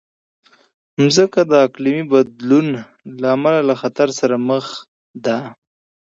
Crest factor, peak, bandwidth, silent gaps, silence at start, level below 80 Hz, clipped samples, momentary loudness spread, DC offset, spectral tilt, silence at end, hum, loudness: 16 dB; 0 dBFS; 8 kHz; 4.88-5.14 s; 1 s; -64 dBFS; under 0.1%; 15 LU; under 0.1%; -5.5 dB/octave; 0.6 s; none; -16 LUFS